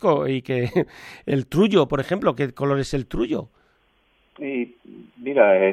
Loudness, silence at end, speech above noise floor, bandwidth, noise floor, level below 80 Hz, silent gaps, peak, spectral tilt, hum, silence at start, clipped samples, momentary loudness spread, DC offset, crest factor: -22 LUFS; 0 s; 42 dB; 14.5 kHz; -63 dBFS; -46 dBFS; none; -2 dBFS; -7 dB/octave; none; 0 s; under 0.1%; 13 LU; under 0.1%; 20 dB